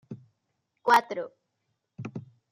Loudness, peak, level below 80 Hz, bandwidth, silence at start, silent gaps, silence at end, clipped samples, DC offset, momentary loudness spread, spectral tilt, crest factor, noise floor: -25 LUFS; -8 dBFS; -78 dBFS; 16 kHz; 0.1 s; none; 0.3 s; under 0.1%; under 0.1%; 23 LU; -4.5 dB/octave; 22 dB; -79 dBFS